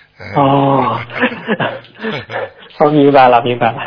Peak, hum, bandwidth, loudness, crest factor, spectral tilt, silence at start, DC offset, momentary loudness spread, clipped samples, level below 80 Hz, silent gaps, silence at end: 0 dBFS; none; 5.4 kHz; -13 LUFS; 12 dB; -9 dB/octave; 0.2 s; under 0.1%; 15 LU; 0.2%; -52 dBFS; none; 0 s